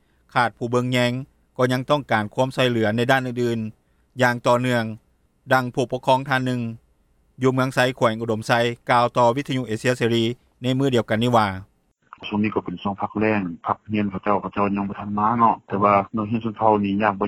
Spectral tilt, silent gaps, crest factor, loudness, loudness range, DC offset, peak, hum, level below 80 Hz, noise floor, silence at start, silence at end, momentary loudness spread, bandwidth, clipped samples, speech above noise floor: -6 dB/octave; none; 20 dB; -22 LUFS; 3 LU; under 0.1%; -2 dBFS; none; -56 dBFS; -62 dBFS; 0.35 s; 0 s; 8 LU; 14.5 kHz; under 0.1%; 41 dB